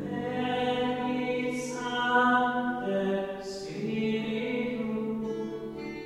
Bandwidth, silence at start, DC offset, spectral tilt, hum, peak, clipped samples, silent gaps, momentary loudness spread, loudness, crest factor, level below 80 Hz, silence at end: 12.5 kHz; 0 s; under 0.1%; -5 dB/octave; none; -12 dBFS; under 0.1%; none; 11 LU; -30 LUFS; 18 dB; -60 dBFS; 0 s